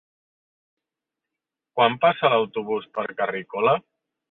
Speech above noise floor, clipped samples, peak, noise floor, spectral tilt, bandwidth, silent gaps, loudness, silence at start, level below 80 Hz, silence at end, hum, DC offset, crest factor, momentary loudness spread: 64 dB; under 0.1%; -4 dBFS; -86 dBFS; -8.5 dB/octave; 4.2 kHz; none; -23 LUFS; 1.75 s; -70 dBFS; 0.5 s; none; under 0.1%; 20 dB; 9 LU